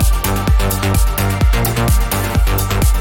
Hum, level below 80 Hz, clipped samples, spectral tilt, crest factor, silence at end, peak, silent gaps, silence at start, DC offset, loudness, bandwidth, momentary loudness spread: none; -16 dBFS; under 0.1%; -5 dB/octave; 10 dB; 0 s; -2 dBFS; none; 0 s; under 0.1%; -16 LUFS; 19 kHz; 2 LU